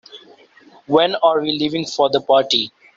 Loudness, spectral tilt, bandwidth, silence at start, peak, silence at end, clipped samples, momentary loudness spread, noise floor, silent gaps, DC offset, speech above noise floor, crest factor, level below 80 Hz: -17 LUFS; -4 dB/octave; 7.6 kHz; 0.15 s; -2 dBFS; 0.3 s; under 0.1%; 5 LU; -48 dBFS; none; under 0.1%; 32 dB; 16 dB; -62 dBFS